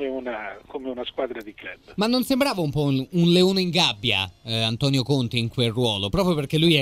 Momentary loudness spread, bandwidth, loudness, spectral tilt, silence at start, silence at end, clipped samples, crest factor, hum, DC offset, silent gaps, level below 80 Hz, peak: 14 LU; 16 kHz; -22 LUFS; -5.5 dB/octave; 0 s; 0 s; under 0.1%; 18 dB; none; under 0.1%; none; -48 dBFS; -4 dBFS